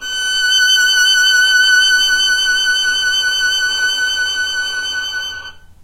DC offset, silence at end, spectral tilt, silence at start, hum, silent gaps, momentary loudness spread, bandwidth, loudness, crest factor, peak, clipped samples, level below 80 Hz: under 0.1%; 0.1 s; 3.5 dB/octave; 0 s; none; none; 10 LU; 16 kHz; -12 LUFS; 12 dB; -2 dBFS; under 0.1%; -46 dBFS